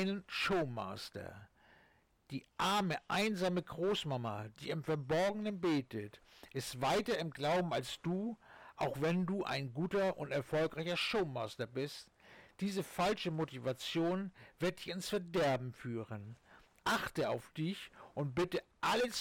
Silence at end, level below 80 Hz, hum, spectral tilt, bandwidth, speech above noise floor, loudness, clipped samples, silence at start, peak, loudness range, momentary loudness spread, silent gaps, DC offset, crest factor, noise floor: 0 s; -68 dBFS; none; -5 dB/octave; 18 kHz; 33 dB; -38 LUFS; under 0.1%; 0 s; -28 dBFS; 2 LU; 12 LU; none; under 0.1%; 10 dB; -70 dBFS